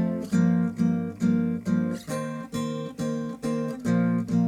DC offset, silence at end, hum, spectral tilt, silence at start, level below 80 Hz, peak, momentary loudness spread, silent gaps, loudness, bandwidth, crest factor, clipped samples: under 0.1%; 0 s; none; -7.5 dB/octave; 0 s; -60 dBFS; -12 dBFS; 8 LU; none; -27 LUFS; 13 kHz; 14 dB; under 0.1%